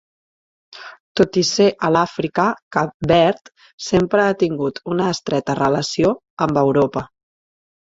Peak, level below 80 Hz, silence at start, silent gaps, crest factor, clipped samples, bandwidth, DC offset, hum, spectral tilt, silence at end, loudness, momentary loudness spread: -2 dBFS; -48 dBFS; 0.75 s; 1.00-1.15 s, 2.62-2.71 s, 2.94-3.00 s, 3.73-3.78 s, 6.30-6.37 s; 18 dB; under 0.1%; 7.8 kHz; under 0.1%; none; -5 dB/octave; 0.75 s; -18 LUFS; 13 LU